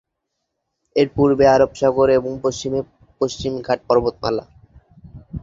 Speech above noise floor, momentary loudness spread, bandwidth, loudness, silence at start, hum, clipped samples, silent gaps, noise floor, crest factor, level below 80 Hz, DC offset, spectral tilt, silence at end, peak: 60 dB; 12 LU; 7.8 kHz; -19 LUFS; 0.95 s; none; under 0.1%; none; -77 dBFS; 18 dB; -44 dBFS; under 0.1%; -6 dB/octave; 0 s; -2 dBFS